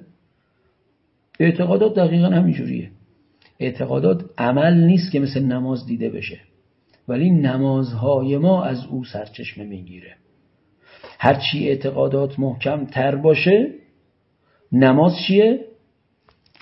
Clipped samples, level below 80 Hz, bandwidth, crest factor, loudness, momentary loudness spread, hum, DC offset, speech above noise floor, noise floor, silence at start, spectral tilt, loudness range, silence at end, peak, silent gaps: under 0.1%; -60 dBFS; 5.8 kHz; 20 dB; -18 LUFS; 14 LU; none; under 0.1%; 47 dB; -65 dBFS; 1.4 s; -10.5 dB/octave; 5 LU; 0.95 s; 0 dBFS; none